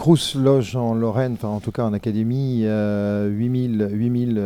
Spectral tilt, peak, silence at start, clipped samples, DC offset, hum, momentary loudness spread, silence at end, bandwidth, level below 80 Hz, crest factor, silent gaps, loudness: -7 dB/octave; -4 dBFS; 0 s; under 0.1%; under 0.1%; none; 6 LU; 0 s; 15 kHz; -52 dBFS; 16 dB; none; -21 LUFS